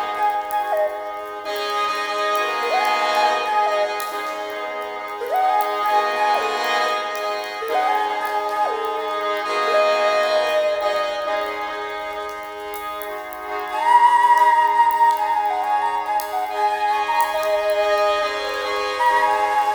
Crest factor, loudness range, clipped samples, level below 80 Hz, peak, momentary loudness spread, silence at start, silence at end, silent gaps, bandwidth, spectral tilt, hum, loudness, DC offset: 16 dB; 4 LU; under 0.1%; -60 dBFS; -4 dBFS; 12 LU; 0 s; 0 s; none; over 20 kHz; -1 dB/octave; none; -20 LUFS; under 0.1%